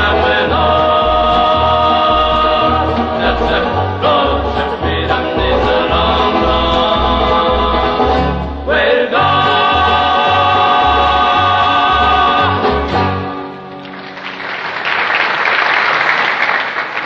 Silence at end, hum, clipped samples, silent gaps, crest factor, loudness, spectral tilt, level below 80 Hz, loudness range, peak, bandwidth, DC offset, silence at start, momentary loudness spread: 0 s; none; under 0.1%; none; 12 dB; -12 LUFS; -6 dB/octave; -26 dBFS; 4 LU; 0 dBFS; 7.4 kHz; under 0.1%; 0 s; 7 LU